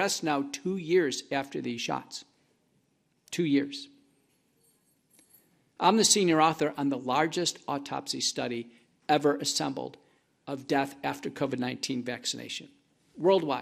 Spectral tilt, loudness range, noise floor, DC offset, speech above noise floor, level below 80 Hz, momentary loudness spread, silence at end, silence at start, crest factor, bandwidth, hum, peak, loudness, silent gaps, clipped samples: -3.5 dB/octave; 8 LU; -72 dBFS; under 0.1%; 43 dB; -74 dBFS; 15 LU; 0 s; 0 s; 22 dB; 15 kHz; none; -8 dBFS; -29 LUFS; none; under 0.1%